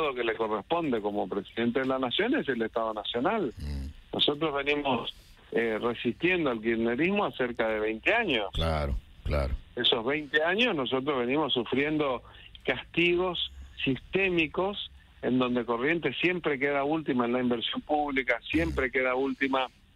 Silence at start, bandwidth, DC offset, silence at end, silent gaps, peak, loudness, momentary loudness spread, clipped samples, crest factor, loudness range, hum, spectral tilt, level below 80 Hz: 0 s; 12 kHz; under 0.1%; 0.3 s; none; -10 dBFS; -28 LUFS; 7 LU; under 0.1%; 18 dB; 2 LU; none; -6.5 dB/octave; -44 dBFS